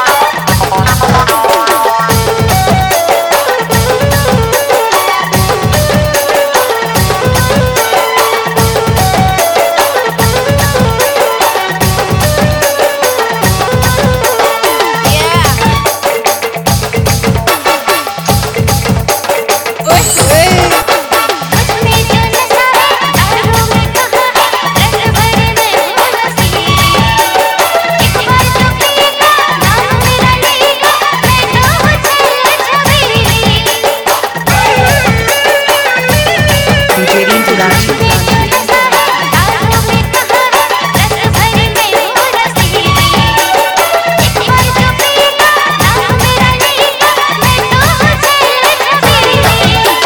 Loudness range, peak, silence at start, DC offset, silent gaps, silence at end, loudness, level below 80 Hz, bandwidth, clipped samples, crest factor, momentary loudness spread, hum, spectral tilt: 2 LU; 0 dBFS; 0 s; under 0.1%; none; 0 s; -8 LUFS; -24 dBFS; 19 kHz; under 0.1%; 8 dB; 3 LU; none; -3.5 dB/octave